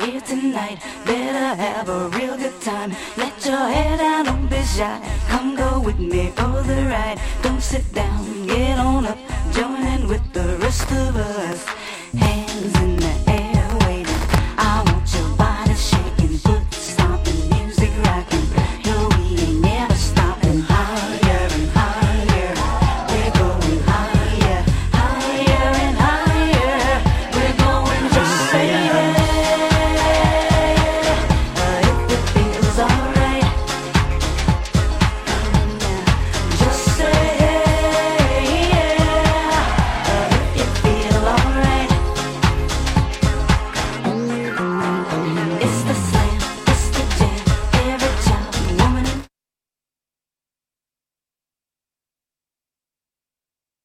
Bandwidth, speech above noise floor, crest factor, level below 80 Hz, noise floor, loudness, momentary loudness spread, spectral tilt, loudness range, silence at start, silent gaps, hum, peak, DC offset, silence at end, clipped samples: 15.5 kHz; over 70 dB; 18 dB; -22 dBFS; under -90 dBFS; -18 LUFS; 7 LU; -5.5 dB/octave; 5 LU; 0 s; none; none; 0 dBFS; under 0.1%; 4.6 s; under 0.1%